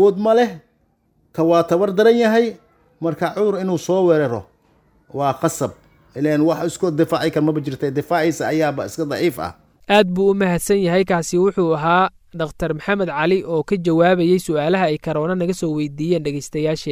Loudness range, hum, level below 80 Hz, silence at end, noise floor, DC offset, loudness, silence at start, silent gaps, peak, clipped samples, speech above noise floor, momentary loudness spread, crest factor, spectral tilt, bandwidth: 3 LU; none; -50 dBFS; 0 s; -62 dBFS; under 0.1%; -18 LUFS; 0 s; none; -2 dBFS; under 0.1%; 44 dB; 9 LU; 16 dB; -6 dB/octave; over 20 kHz